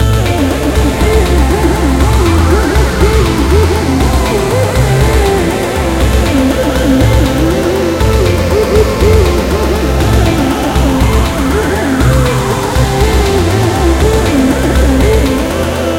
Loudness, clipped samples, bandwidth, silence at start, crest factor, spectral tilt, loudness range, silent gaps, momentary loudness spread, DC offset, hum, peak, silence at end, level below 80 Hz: -11 LUFS; 0.2%; 16.5 kHz; 0 s; 10 dB; -6 dB/octave; 1 LU; none; 3 LU; 0.2%; none; 0 dBFS; 0 s; -14 dBFS